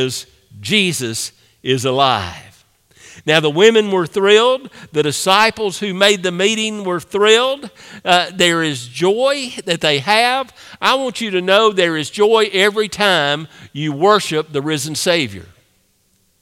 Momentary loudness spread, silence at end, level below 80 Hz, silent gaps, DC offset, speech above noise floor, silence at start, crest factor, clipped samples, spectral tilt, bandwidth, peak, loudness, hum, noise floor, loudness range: 12 LU; 0.95 s; -58 dBFS; none; under 0.1%; 44 dB; 0 s; 16 dB; under 0.1%; -3.5 dB/octave; 16.5 kHz; 0 dBFS; -15 LUFS; none; -60 dBFS; 3 LU